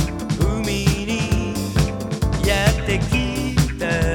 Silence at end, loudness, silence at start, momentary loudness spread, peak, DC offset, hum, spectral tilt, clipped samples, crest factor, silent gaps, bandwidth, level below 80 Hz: 0 s; -21 LUFS; 0 s; 4 LU; -2 dBFS; under 0.1%; none; -5.5 dB/octave; under 0.1%; 18 dB; none; 18.5 kHz; -26 dBFS